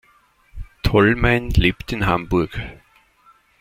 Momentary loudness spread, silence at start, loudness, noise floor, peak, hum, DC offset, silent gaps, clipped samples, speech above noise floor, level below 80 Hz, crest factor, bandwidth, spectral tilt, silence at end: 12 LU; 0.55 s; -19 LUFS; -57 dBFS; -2 dBFS; none; under 0.1%; none; under 0.1%; 39 dB; -30 dBFS; 18 dB; 16.5 kHz; -7 dB/octave; 0.85 s